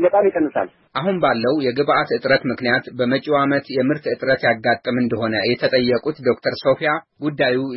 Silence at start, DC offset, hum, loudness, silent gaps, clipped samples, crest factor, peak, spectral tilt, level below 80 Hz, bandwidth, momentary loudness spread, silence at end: 0 s; under 0.1%; none; -19 LUFS; none; under 0.1%; 16 dB; -4 dBFS; -10 dB/octave; -58 dBFS; 5.8 kHz; 4 LU; 0 s